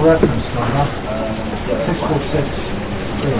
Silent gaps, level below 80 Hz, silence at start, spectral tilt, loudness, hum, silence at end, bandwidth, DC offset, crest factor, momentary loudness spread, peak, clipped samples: none; -30 dBFS; 0 s; -11 dB/octave; -19 LUFS; none; 0 s; 4 kHz; 3%; 16 dB; 7 LU; -2 dBFS; under 0.1%